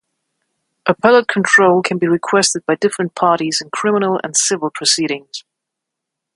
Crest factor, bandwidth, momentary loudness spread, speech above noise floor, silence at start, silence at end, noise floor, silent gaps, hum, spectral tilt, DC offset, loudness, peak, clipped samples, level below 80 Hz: 16 dB; 11.5 kHz; 9 LU; 65 dB; 0.85 s; 0.95 s; -80 dBFS; none; none; -3 dB/octave; under 0.1%; -15 LUFS; 0 dBFS; under 0.1%; -62 dBFS